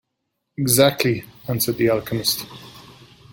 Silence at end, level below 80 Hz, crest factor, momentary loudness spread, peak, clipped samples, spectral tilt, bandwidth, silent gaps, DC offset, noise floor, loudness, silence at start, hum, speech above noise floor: 0.4 s; -54 dBFS; 20 dB; 19 LU; -2 dBFS; under 0.1%; -4 dB/octave; 17 kHz; none; under 0.1%; -77 dBFS; -20 LUFS; 0.6 s; none; 57 dB